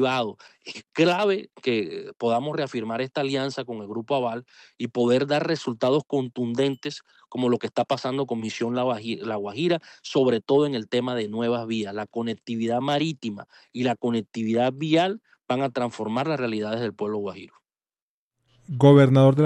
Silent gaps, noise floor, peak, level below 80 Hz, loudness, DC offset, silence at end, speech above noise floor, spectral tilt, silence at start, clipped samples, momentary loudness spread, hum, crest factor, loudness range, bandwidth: 18.02-18.31 s; under -90 dBFS; -6 dBFS; -70 dBFS; -25 LUFS; under 0.1%; 0 s; over 66 dB; -7 dB/octave; 0 s; under 0.1%; 12 LU; none; 18 dB; 2 LU; 9.8 kHz